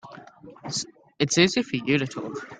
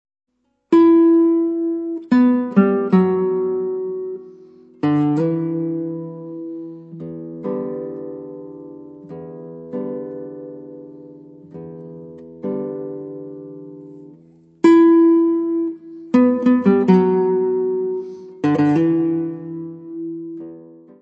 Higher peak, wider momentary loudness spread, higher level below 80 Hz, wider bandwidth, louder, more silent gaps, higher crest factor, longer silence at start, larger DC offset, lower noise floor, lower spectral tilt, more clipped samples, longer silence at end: about the same, -4 dBFS vs -2 dBFS; about the same, 21 LU vs 22 LU; first, -62 dBFS vs -70 dBFS; first, 9.6 kHz vs 7.4 kHz; second, -24 LUFS vs -17 LUFS; neither; about the same, 22 dB vs 18 dB; second, 0.05 s vs 0.7 s; neither; about the same, -46 dBFS vs -49 dBFS; second, -4 dB/octave vs -9.5 dB/octave; neither; second, 0 s vs 0.35 s